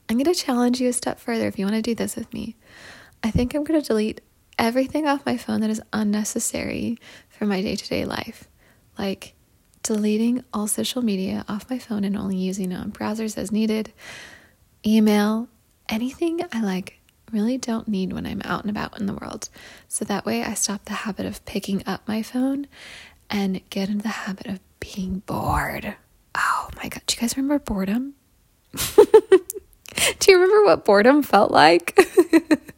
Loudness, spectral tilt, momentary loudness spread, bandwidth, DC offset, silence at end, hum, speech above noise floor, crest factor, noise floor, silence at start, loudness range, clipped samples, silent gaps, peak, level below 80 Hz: -22 LUFS; -4.5 dB/octave; 17 LU; 16.5 kHz; under 0.1%; 0.05 s; none; 39 dB; 22 dB; -61 dBFS; 0.1 s; 10 LU; under 0.1%; none; 0 dBFS; -48 dBFS